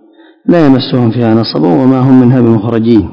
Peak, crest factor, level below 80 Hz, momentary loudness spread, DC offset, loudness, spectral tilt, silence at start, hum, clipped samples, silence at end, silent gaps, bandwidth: 0 dBFS; 8 dB; -38 dBFS; 5 LU; under 0.1%; -8 LUFS; -9.5 dB/octave; 0.45 s; none; 5%; 0 s; none; 5.4 kHz